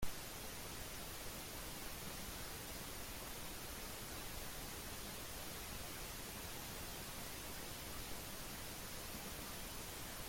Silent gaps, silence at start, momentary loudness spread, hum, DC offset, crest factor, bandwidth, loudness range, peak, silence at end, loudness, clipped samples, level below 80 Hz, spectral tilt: none; 0 s; 1 LU; none; under 0.1%; 20 dB; 16.5 kHz; 0 LU; -28 dBFS; 0 s; -48 LUFS; under 0.1%; -56 dBFS; -2.5 dB/octave